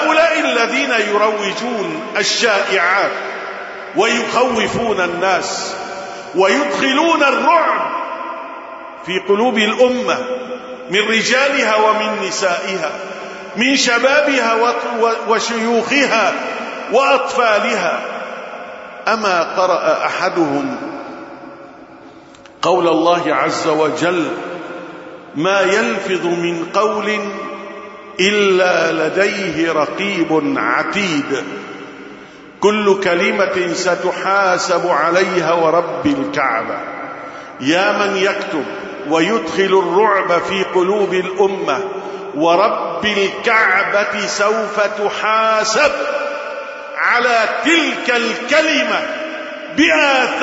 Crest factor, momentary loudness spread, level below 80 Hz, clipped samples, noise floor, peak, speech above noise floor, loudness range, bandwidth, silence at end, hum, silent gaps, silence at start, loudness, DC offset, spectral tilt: 16 dB; 14 LU; -58 dBFS; under 0.1%; -40 dBFS; 0 dBFS; 25 dB; 3 LU; 8 kHz; 0 s; none; none; 0 s; -15 LUFS; under 0.1%; -3.5 dB/octave